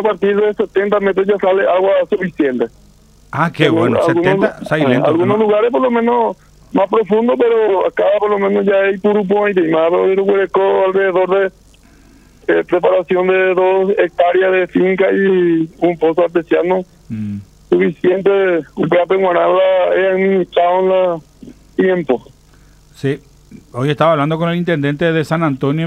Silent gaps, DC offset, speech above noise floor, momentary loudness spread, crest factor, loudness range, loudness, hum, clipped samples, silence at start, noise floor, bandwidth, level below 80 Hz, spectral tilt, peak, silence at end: none; under 0.1%; 32 dB; 7 LU; 14 dB; 4 LU; -14 LUFS; none; under 0.1%; 0 s; -45 dBFS; 9.2 kHz; -50 dBFS; -7.5 dB/octave; 0 dBFS; 0 s